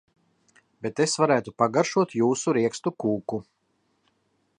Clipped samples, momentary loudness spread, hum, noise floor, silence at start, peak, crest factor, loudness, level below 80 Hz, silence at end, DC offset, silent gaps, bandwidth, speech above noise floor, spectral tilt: under 0.1%; 11 LU; none; -71 dBFS; 0.8 s; -6 dBFS; 20 dB; -25 LUFS; -68 dBFS; 1.15 s; under 0.1%; none; 11 kHz; 47 dB; -5 dB/octave